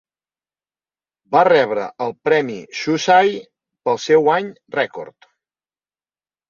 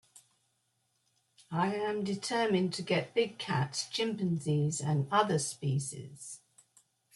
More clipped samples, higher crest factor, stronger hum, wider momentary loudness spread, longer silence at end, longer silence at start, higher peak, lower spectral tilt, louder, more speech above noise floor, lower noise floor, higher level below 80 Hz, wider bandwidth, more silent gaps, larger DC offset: neither; about the same, 18 dB vs 20 dB; neither; about the same, 13 LU vs 12 LU; first, 1.4 s vs 0.8 s; first, 1.3 s vs 0.15 s; first, -2 dBFS vs -14 dBFS; about the same, -4.5 dB/octave vs -5 dB/octave; first, -17 LUFS vs -32 LUFS; first, over 73 dB vs 45 dB; first, under -90 dBFS vs -77 dBFS; first, -66 dBFS vs -74 dBFS; second, 7.4 kHz vs 12 kHz; neither; neither